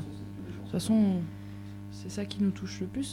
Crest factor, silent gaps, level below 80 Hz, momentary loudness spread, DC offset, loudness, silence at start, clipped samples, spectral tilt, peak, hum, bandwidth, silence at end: 16 dB; none; -58 dBFS; 17 LU; under 0.1%; -32 LUFS; 0 s; under 0.1%; -6.5 dB/octave; -16 dBFS; 50 Hz at -40 dBFS; 13.5 kHz; 0 s